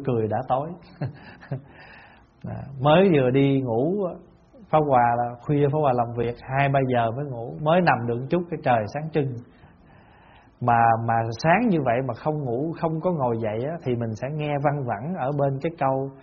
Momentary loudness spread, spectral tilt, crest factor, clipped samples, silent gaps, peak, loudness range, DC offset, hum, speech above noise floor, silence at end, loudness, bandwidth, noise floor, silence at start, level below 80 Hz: 15 LU; -6.5 dB/octave; 20 dB; under 0.1%; none; -4 dBFS; 4 LU; under 0.1%; none; 29 dB; 0.05 s; -23 LUFS; 6.6 kHz; -52 dBFS; 0 s; -54 dBFS